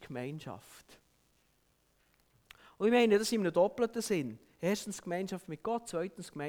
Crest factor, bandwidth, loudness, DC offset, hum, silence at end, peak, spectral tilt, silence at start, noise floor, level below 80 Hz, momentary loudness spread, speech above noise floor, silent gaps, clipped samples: 18 dB; 19.5 kHz; -33 LUFS; under 0.1%; none; 0 s; -16 dBFS; -5 dB/octave; 0 s; -73 dBFS; -70 dBFS; 15 LU; 40 dB; none; under 0.1%